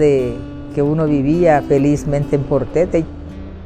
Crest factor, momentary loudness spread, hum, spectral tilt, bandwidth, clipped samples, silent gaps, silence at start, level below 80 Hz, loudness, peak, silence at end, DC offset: 14 dB; 14 LU; none; -8 dB/octave; 9.6 kHz; under 0.1%; none; 0 s; -34 dBFS; -16 LUFS; -2 dBFS; 0 s; under 0.1%